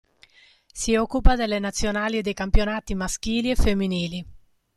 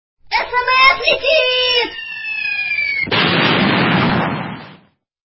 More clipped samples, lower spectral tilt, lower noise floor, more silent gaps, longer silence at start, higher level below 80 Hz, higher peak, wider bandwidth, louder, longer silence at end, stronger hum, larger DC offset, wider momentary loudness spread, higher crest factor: neither; second, -4.5 dB/octave vs -7.5 dB/octave; first, -56 dBFS vs -50 dBFS; neither; first, 0.75 s vs 0.3 s; first, -28 dBFS vs -46 dBFS; about the same, -2 dBFS vs 0 dBFS; first, 12.5 kHz vs 6 kHz; second, -25 LUFS vs -14 LUFS; second, 0.4 s vs 0.6 s; neither; neither; second, 7 LU vs 12 LU; about the same, 20 dB vs 16 dB